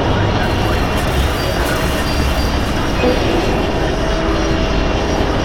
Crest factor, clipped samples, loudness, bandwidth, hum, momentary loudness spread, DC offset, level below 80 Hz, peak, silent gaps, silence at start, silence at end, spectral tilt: 12 dB; under 0.1%; -16 LUFS; 18 kHz; none; 2 LU; under 0.1%; -20 dBFS; -2 dBFS; none; 0 s; 0 s; -5.5 dB/octave